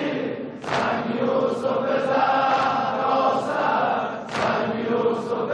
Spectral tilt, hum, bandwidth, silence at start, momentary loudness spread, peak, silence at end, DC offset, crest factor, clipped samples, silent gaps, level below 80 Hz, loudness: -5.5 dB/octave; none; 11 kHz; 0 s; 6 LU; -8 dBFS; 0 s; under 0.1%; 14 dB; under 0.1%; none; -64 dBFS; -23 LUFS